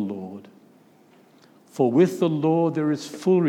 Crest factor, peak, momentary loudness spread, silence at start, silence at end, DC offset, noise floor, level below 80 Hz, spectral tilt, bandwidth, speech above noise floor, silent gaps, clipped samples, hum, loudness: 18 dB; -6 dBFS; 20 LU; 0 s; 0 s; under 0.1%; -55 dBFS; -82 dBFS; -7.5 dB/octave; 14 kHz; 34 dB; none; under 0.1%; none; -22 LUFS